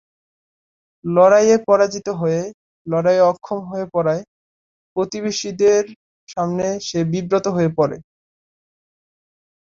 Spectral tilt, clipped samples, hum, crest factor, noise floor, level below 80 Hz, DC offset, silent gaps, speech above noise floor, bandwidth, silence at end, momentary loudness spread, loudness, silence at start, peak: -5.5 dB/octave; under 0.1%; none; 18 dB; under -90 dBFS; -60 dBFS; under 0.1%; 2.54-2.85 s, 4.28-4.96 s, 5.96-6.27 s; over 73 dB; 7.6 kHz; 1.7 s; 13 LU; -18 LUFS; 1.05 s; -2 dBFS